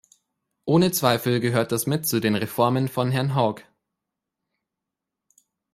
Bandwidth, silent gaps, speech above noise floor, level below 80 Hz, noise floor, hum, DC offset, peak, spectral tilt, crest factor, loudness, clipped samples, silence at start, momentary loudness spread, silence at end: 16 kHz; none; 63 dB; -62 dBFS; -85 dBFS; none; under 0.1%; -4 dBFS; -5.5 dB/octave; 22 dB; -22 LUFS; under 0.1%; 0.65 s; 4 LU; 2.1 s